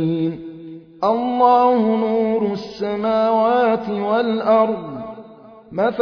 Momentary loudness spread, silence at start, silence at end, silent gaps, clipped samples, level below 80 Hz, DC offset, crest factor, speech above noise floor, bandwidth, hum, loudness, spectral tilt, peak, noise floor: 18 LU; 0 s; 0 s; none; under 0.1%; -58 dBFS; under 0.1%; 16 dB; 25 dB; 5.4 kHz; none; -18 LUFS; -8 dB/octave; -2 dBFS; -42 dBFS